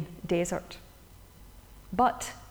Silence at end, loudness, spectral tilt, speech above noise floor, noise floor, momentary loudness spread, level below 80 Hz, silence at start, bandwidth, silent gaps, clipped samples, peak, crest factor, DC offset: 0 s; -30 LUFS; -5 dB/octave; 23 dB; -53 dBFS; 17 LU; -52 dBFS; 0 s; over 20 kHz; none; under 0.1%; -14 dBFS; 20 dB; under 0.1%